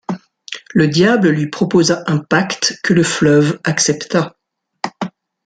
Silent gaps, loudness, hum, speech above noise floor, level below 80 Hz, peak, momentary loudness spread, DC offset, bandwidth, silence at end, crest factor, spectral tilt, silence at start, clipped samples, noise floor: none; -14 LUFS; none; 20 dB; -54 dBFS; -2 dBFS; 15 LU; under 0.1%; 9.4 kHz; 0.35 s; 14 dB; -4.5 dB/octave; 0.1 s; under 0.1%; -34 dBFS